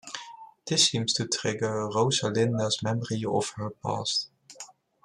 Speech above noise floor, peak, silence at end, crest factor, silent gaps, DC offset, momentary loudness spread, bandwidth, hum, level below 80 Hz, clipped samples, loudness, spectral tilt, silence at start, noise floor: 22 dB; -8 dBFS; 0.4 s; 22 dB; none; under 0.1%; 21 LU; 12.5 kHz; none; -68 dBFS; under 0.1%; -27 LUFS; -3.5 dB/octave; 0.05 s; -49 dBFS